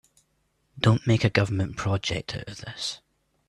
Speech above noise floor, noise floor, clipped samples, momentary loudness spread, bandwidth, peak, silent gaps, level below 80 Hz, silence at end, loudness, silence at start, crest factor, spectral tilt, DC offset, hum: 46 dB; -71 dBFS; under 0.1%; 13 LU; 11.5 kHz; -6 dBFS; none; -52 dBFS; 0.5 s; -26 LUFS; 0.75 s; 22 dB; -5.5 dB/octave; under 0.1%; none